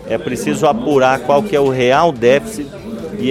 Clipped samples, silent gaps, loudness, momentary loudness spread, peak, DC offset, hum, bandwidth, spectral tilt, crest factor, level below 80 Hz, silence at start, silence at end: under 0.1%; none; -14 LUFS; 14 LU; 0 dBFS; under 0.1%; none; 15.5 kHz; -5.5 dB/octave; 14 dB; -44 dBFS; 0 s; 0 s